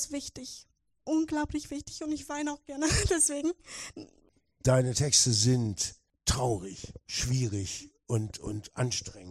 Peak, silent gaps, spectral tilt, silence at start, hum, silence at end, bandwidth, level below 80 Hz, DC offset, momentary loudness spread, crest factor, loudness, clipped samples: -10 dBFS; none; -4 dB/octave; 0 s; none; 0 s; 14.5 kHz; -48 dBFS; under 0.1%; 17 LU; 22 dB; -29 LUFS; under 0.1%